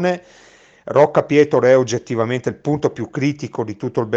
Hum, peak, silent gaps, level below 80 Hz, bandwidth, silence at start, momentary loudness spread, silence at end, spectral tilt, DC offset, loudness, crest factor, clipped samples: none; 0 dBFS; none; -58 dBFS; 8 kHz; 0 s; 11 LU; 0 s; -6.5 dB/octave; under 0.1%; -18 LUFS; 16 dB; under 0.1%